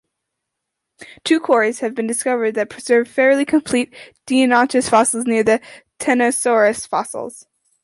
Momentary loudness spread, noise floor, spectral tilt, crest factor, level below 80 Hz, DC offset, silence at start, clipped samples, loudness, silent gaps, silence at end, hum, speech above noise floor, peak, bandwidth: 10 LU; -79 dBFS; -3 dB/octave; 16 dB; -58 dBFS; under 0.1%; 1 s; under 0.1%; -17 LUFS; none; 0.45 s; none; 62 dB; -2 dBFS; 12 kHz